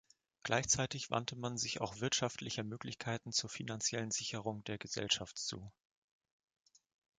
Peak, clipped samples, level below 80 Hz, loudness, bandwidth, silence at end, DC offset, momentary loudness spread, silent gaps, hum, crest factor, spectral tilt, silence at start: -16 dBFS; under 0.1%; -68 dBFS; -38 LUFS; 9.8 kHz; 1.5 s; under 0.1%; 10 LU; none; none; 24 dB; -2.5 dB/octave; 0.45 s